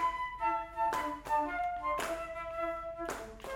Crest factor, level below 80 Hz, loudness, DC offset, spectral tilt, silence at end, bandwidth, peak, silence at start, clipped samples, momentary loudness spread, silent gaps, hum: 14 dB; -56 dBFS; -36 LUFS; under 0.1%; -3.5 dB/octave; 0 s; 18 kHz; -22 dBFS; 0 s; under 0.1%; 6 LU; none; none